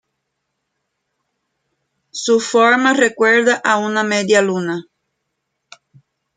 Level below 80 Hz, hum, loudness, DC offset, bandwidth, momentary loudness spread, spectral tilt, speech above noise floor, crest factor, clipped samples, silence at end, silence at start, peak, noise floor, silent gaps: -68 dBFS; none; -15 LUFS; under 0.1%; 9.6 kHz; 12 LU; -3.5 dB/octave; 60 dB; 18 dB; under 0.1%; 1.55 s; 2.15 s; 0 dBFS; -74 dBFS; none